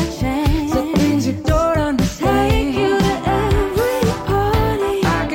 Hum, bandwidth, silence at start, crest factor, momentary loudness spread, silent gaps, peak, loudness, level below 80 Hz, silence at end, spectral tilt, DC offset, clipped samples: none; 17 kHz; 0 s; 12 dB; 2 LU; none; -4 dBFS; -17 LUFS; -26 dBFS; 0 s; -6 dB/octave; under 0.1%; under 0.1%